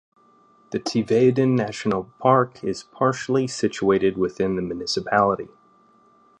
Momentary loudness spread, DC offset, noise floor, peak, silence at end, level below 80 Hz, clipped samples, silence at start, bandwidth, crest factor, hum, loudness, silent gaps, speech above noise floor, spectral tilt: 11 LU; under 0.1%; -57 dBFS; -2 dBFS; 0.95 s; -56 dBFS; under 0.1%; 0.7 s; 10 kHz; 20 dB; none; -22 LUFS; none; 35 dB; -6 dB/octave